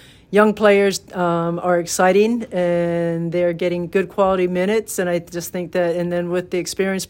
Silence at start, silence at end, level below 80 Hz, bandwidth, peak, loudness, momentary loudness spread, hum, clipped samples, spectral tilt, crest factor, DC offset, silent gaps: 0.3 s; 0.05 s; -54 dBFS; 16.5 kHz; 0 dBFS; -19 LUFS; 8 LU; none; under 0.1%; -5 dB/octave; 18 dB; under 0.1%; none